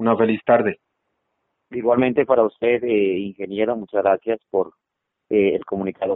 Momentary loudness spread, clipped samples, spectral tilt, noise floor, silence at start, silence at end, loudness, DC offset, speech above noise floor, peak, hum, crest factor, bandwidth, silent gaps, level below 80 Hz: 9 LU; under 0.1%; -5 dB/octave; -80 dBFS; 0 s; 0 s; -20 LUFS; under 0.1%; 60 dB; -2 dBFS; none; 18 dB; 4 kHz; none; -60 dBFS